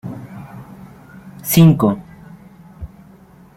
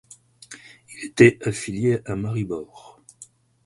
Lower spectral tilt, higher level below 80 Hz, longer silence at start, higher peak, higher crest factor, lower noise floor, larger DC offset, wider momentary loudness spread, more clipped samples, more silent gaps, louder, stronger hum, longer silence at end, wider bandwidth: about the same, -6.5 dB/octave vs -6 dB/octave; first, -46 dBFS vs -54 dBFS; second, 0.05 s vs 0.5 s; about the same, -2 dBFS vs -2 dBFS; about the same, 18 dB vs 22 dB; second, -45 dBFS vs -50 dBFS; neither; about the same, 26 LU vs 26 LU; neither; neither; first, -14 LUFS vs -21 LUFS; neither; first, 0.7 s vs 0.4 s; first, 16.5 kHz vs 11.5 kHz